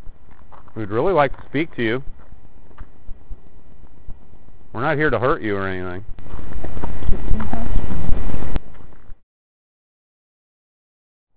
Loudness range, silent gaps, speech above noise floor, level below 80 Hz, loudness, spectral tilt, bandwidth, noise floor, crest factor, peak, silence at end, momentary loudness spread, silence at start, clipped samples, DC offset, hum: 8 LU; 9.23-11.27 s; 27 dB; -32 dBFS; -24 LUFS; -9.5 dB/octave; 4 kHz; -45 dBFS; 14 dB; 0 dBFS; 0 s; 26 LU; 0 s; 0.6%; under 0.1%; none